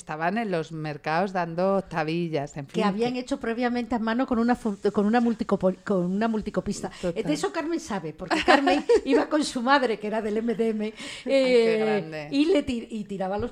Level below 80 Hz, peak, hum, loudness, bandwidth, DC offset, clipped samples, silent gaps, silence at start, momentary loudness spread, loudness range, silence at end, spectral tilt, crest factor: -54 dBFS; -6 dBFS; none; -25 LUFS; 12 kHz; under 0.1%; under 0.1%; none; 0.05 s; 10 LU; 4 LU; 0 s; -5.5 dB/octave; 20 dB